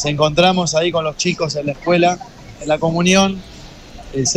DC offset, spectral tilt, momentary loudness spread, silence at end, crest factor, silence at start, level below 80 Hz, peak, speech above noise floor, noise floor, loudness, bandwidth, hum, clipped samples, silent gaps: under 0.1%; -4 dB/octave; 15 LU; 0 s; 16 dB; 0 s; -42 dBFS; -2 dBFS; 20 dB; -36 dBFS; -16 LUFS; 12 kHz; none; under 0.1%; none